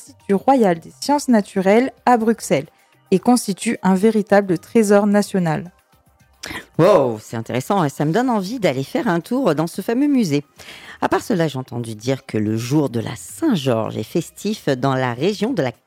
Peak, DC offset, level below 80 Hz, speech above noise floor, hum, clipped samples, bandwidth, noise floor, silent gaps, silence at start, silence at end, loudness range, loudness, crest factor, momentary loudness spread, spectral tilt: -2 dBFS; under 0.1%; -58 dBFS; 37 dB; none; under 0.1%; 16.5 kHz; -55 dBFS; none; 0 s; 0.15 s; 4 LU; -19 LUFS; 16 dB; 11 LU; -6 dB/octave